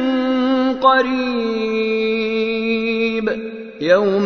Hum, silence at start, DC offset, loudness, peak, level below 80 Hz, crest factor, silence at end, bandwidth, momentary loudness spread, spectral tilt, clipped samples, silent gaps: none; 0 s; under 0.1%; -18 LUFS; 0 dBFS; -52 dBFS; 16 dB; 0 s; 6.6 kHz; 8 LU; -6 dB/octave; under 0.1%; none